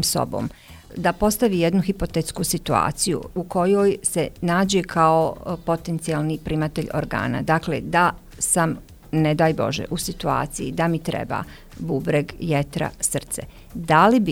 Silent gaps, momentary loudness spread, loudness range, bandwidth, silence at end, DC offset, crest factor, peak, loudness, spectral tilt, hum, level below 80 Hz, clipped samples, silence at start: none; 9 LU; 4 LU; 17 kHz; 0 s; under 0.1%; 20 dB; -2 dBFS; -22 LUFS; -5 dB/octave; none; -42 dBFS; under 0.1%; 0 s